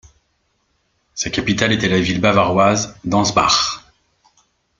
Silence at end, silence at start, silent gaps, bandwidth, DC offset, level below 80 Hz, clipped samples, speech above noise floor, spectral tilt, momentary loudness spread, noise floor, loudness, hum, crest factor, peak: 1 s; 1.15 s; none; 9.2 kHz; under 0.1%; -46 dBFS; under 0.1%; 50 dB; -4 dB/octave; 9 LU; -66 dBFS; -16 LUFS; none; 18 dB; 0 dBFS